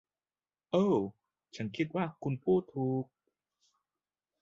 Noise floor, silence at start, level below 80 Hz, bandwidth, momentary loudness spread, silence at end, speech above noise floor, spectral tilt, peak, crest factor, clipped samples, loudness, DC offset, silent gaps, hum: under -90 dBFS; 0.75 s; -72 dBFS; 7.6 kHz; 13 LU; 1.4 s; over 58 dB; -8 dB/octave; -16 dBFS; 20 dB; under 0.1%; -33 LUFS; under 0.1%; none; 50 Hz at -65 dBFS